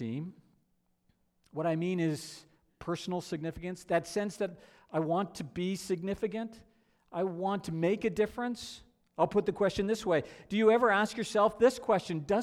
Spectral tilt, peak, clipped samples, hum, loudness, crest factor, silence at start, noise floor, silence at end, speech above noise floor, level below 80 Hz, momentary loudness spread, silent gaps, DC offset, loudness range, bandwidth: -5.5 dB/octave; -14 dBFS; under 0.1%; none; -32 LUFS; 18 dB; 0 s; -74 dBFS; 0 s; 43 dB; -62 dBFS; 15 LU; none; under 0.1%; 8 LU; 14.5 kHz